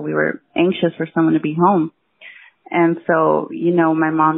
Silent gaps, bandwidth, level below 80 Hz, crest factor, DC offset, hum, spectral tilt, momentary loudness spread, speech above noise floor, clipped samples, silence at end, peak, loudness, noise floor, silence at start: none; 3.9 kHz; -62 dBFS; 14 dB; under 0.1%; none; -5.5 dB/octave; 5 LU; 26 dB; under 0.1%; 0 s; -4 dBFS; -17 LUFS; -43 dBFS; 0 s